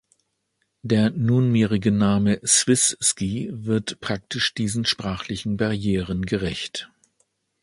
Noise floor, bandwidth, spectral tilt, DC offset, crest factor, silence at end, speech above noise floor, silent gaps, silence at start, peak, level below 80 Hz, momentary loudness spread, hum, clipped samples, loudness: -74 dBFS; 11.5 kHz; -4 dB/octave; under 0.1%; 20 dB; 0.75 s; 52 dB; none; 0.85 s; -4 dBFS; -48 dBFS; 11 LU; none; under 0.1%; -22 LUFS